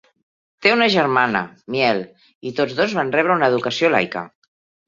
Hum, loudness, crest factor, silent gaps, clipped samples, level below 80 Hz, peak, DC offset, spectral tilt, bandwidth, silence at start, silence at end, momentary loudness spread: none; -18 LUFS; 18 dB; 2.35-2.41 s; under 0.1%; -62 dBFS; -2 dBFS; under 0.1%; -5 dB/octave; 7.6 kHz; 0.6 s; 0.6 s; 13 LU